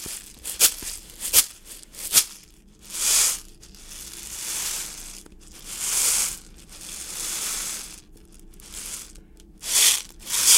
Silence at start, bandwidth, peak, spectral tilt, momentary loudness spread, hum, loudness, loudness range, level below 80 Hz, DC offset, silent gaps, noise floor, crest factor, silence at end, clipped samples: 0 s; 17 kHz; 0 dBFS; 2 dB/octave; 21 LU; none; -22 LUFS; 6 LU; -48 dBFS; under 0.1%; none; -50 dBFS; 26 dB; 0 s; under 0.1%